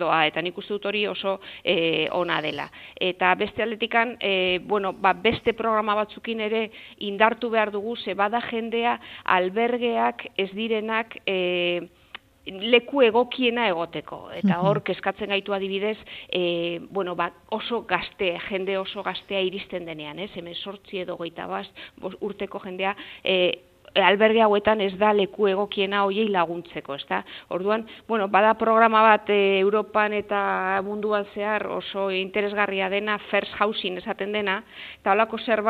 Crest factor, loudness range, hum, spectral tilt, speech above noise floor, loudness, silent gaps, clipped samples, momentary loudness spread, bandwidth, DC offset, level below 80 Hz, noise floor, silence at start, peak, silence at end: 24 dB; 7 LU; none; -6.5 dB/octave; 23 dB; -24 LUFS; none; under 0.1%; 13 LU; 6 kHz; under 0.1%; -62 dBFS; -47 dBFS; 0 s; -2 dBFS; 0 s